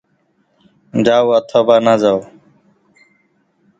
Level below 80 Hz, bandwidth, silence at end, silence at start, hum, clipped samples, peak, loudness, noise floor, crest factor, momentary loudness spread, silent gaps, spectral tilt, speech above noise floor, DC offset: -60 dBFS; 7.8 kHz; 1.55 s; 0.95 s; none; under 0.1%; 0 dBFS; -13 LUFS; -61 dBFS; 16 dB; 8 LU; none; -6 dB/octave; 49 dB; under 0.1%